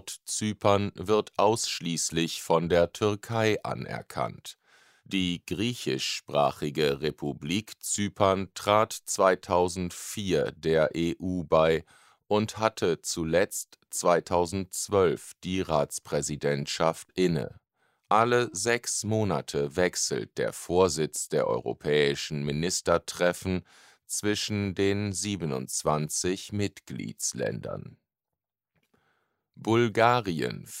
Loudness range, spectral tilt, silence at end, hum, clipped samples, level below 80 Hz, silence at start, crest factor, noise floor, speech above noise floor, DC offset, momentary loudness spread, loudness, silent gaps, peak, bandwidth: 4 LU; -4 dB/octave; 0 s; none; under 0.1%; -56 dBFS; 0.05 s; 22 dB; under -90 dBFS; over 62 dB; under 0.1%; 9 LU; -28 LUFS; none; -6 dBFS; 16 kHz